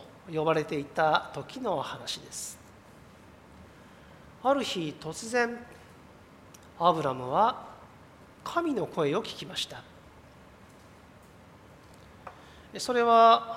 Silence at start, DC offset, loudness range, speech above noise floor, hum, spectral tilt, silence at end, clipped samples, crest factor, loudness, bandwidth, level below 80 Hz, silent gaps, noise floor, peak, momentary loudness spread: 0 s; under 0.1%; 9 LU; 26 dB; none; -4 dB/octave; 0 s; under 0.1%; 22 dB; -28 LUFS; 16 kHz; -64 dBFS; none; -53 dBFS; -8 dBFS; 18 LU